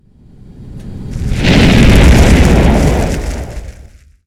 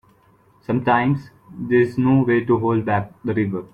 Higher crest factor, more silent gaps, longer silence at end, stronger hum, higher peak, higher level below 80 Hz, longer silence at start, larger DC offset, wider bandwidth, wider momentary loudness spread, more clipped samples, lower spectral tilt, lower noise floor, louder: second, 10 dB vs 16 dB; neither; first, 0.55 s vs 0.1 s; neither; first, 0 dBFS vs -4 dBFS; first, -14 dBFS vs -54 dBFS; about the same, 0.6 s vs 0.7 s; neither; first, 15 kHz vs 5.4 kHz; first, 21 LU vs 8 LU; neither; second, -6 dB/octave vs -9.5 dB/octave; second, -38 dBFS vs -55 dBFS; first, -9 LUFS vs -20 LUFS